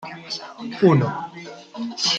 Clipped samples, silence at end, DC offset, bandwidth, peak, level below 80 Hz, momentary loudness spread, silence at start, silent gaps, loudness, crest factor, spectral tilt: under 0.1%; 0 s; under 0.1%; 9 kHz; -2 dBFS; -64 dBFS; 19 LU; 0 s; none; -22 LUFS; 20 dB; -5 dB/octave